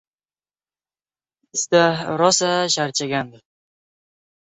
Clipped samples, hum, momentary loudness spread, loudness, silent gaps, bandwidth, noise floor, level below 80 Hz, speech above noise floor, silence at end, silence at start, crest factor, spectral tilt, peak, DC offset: under 0.1%; 50 Hz at -55 dBFS; 9 LU; -19 LUFS; none; 8.4 kHz; under -90 dBFS; -66 dBFS; over 71 dB; 1.2 s; 1.55 s; 20 dB; -3 dB/octave; -2 dBFS; under 0.1%